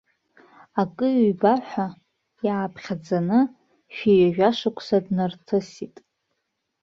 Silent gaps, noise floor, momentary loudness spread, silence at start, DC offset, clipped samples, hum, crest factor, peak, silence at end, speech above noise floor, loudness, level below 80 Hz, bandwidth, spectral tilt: none; -77 dBFS; 13 LU; 0.75 s; under 0.1%; under 0.1%; none; 18 dB; -6 dBFS; 0.95 s; 55 dB; -23 LUFS; -64 dBFS; 7.4 kHz; -7.5 dB/octave